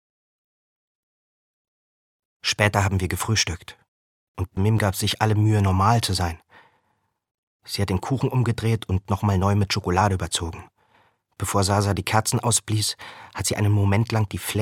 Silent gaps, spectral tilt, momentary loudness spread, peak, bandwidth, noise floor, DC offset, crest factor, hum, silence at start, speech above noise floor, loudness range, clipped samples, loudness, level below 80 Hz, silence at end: 3.88-4.35 s, 7.31-7.60 s; -4.5 dB/octave; 11 LU; -2 dBFS; 16 kHz; -71 dBFS; under 0.1%; 22 dB; none; 2.45 s; 49 dB; 3 LU; under 0.1%; -22 LUFS; -46 dBFS; 0 s